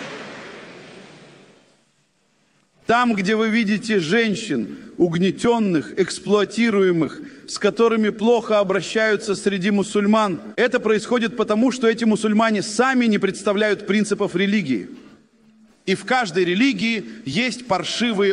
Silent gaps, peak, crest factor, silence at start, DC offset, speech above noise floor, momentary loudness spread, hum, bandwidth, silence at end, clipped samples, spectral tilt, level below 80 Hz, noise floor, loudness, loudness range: none; -6 dBFS; 16 dB; 0 s; under 0.1%; 44 dB; 9 LU; none; 11 kHz; 0 s; under 0.1%; -5 dB/octave; -60 dBFS; -64 dBFS; -20 LUFS; 3 LU